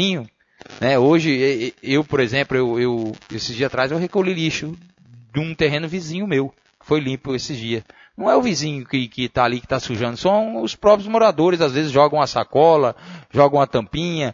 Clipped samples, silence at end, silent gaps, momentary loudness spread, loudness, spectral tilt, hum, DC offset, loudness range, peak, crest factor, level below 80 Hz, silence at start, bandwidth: under 0.1%; 0 s; none; 11 LU; -19 LUFS; -5.5 dB/octave; none; under 0.1%; 6 LU; 0 dBFS; 18 dB; -50 dBFS; 0 s; 7.6 kHz